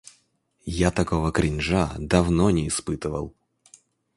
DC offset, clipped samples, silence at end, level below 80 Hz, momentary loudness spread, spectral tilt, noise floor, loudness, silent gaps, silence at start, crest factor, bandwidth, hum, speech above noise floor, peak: under 0.1%; under 0.1%; 0.85 s; -36 dBFS; 12 LU; -5.5 dB/octave; -66 dBFS; -24 LUFS; none; 0.65 s; 22 dB; 11.5 kHz; none; 43 dB; -2 dBFS